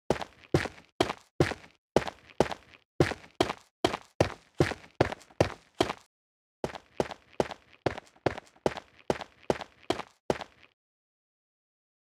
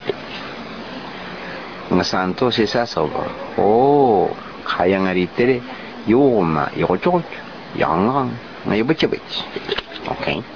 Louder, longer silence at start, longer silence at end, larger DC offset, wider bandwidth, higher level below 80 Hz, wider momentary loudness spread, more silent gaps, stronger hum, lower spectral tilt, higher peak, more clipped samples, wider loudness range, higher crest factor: second, -33 LUFS vs -19 LUFS; about the same, 0.1 s vs 0 s; first, 1.6 s vs 0 s; second, under 0.1% vs 0.4%; first, 15.5 kHz vs 5.4 kHz; second, -54 dBFS vs -48 dBFS; second, 8 LU vs 16 LU; first, 0.92-0.99 s, 1.31-1.39 s, 1.78-1.95 s, 2.85-2.99 s, 3.71-3.83 s, 4.15-4.20 s, 6.06-6.63 s, 10.20-10.29 s vs none; neither; about the same, -5.5 dB/octave vs -6.5 dB/octave; about the same, -6 dBFS vs -4 dBFS; neither; about the same, 5 LU vs 4 LU; first, 28 dB vs 16 dB